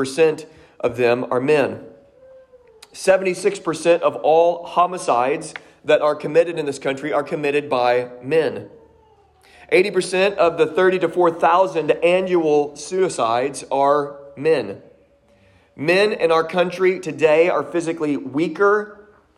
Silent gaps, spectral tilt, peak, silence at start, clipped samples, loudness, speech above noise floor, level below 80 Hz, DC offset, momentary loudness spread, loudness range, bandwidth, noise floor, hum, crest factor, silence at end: none; -5 dB/octave; -4 dBFS; 0 s; under 0.1%; -19 LUFS; 37 dB; -62 dBFS; under 0.1%; 8 LU; 4 LU; 12.5 kHz; -55 dBFS; none; 16 dB; 0.45 s